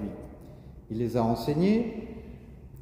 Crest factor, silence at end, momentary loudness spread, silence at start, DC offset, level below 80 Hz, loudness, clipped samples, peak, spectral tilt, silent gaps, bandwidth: 18 dB; 0 s; 23 LU; 0 s; under 0.1%; -50 dBFS; -28 LUFS; under 0.1%; -12 dBFS; -8 dB/octave; none; 16 kHz